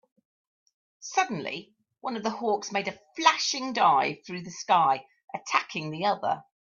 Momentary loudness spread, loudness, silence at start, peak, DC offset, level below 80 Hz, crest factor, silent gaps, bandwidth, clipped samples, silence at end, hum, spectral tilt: 15 LU; -27 LUFS; 1 s; -4 dBFS; under 0.1%; -76 dBFS; 24 dB; 5.24-5.28 s; 7.4 kHz; under 0.1%; 0.35 s; none; -3 dB/octave